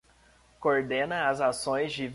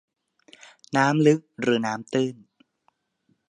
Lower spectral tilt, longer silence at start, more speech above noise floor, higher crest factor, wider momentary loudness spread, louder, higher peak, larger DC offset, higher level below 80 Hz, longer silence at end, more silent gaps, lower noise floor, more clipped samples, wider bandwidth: second, -4 dB/octave vs -6 dB/octave; second, 0.6 s vs 0.9 s; second, 33 dB vs 47 dB; about the same, 18 dB vs 20 dB; second, 3 LU vs 8 LU; second, -28 LUFS vs -23 LUFS; second, -12 dBFS vs -6 dBFS; neither; first, -62 dBFS vs -74 dBFS; second, 0 s vs 1.15 s; neither; second, -61 dBFS vs -70 dBFS; neither; about the same, 11.5 kHz vs 10.5 kHz